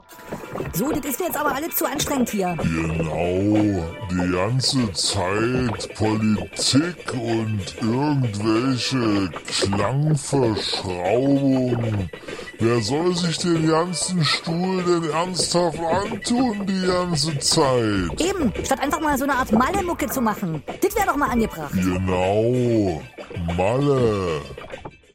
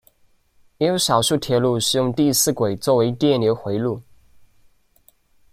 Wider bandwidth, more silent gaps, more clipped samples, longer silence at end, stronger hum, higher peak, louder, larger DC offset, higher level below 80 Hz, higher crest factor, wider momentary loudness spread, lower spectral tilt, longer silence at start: about the same, 16.5 kHz vs 16 kHz; neither; neither; second, 0.25 s vs 1.5 s; neither; about the same, -6 dBFS vs -4 dBFS; about the same, -21 LUFS vs -19 LUFS; neither; first, -44 dBFS vs -56 dBFS; about the same, 16 dB vs 18 dB; about the same, 7 LU vs 6 LU; about the same, -5 dB/octave vs -4.5 dB/octave; second, 0.1 s vs 0.8 s